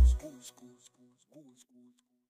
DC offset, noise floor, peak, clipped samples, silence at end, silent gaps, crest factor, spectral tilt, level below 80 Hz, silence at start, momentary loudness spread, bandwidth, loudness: under 0.1%; -65 dBFS; -14 dBFS; under 0.1%; 2 s; none; 18 dB; -6.5 dB/octave; -34 dBFS; 0 s; 26 LU; 10 kHz; -33 LUFS